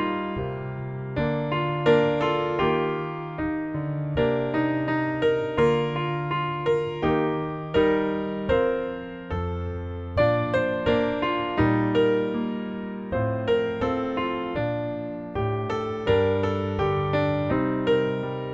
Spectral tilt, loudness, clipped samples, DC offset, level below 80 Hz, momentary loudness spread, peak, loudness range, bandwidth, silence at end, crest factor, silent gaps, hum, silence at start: -8 dB/octave; -25 LUFS; under 0.1%; under 0.1%; -46 dBFS; 9 LU; -8 dBFS; 2 LU; 7.4 kHz; 0 s; 16 dB; none; none; 0 s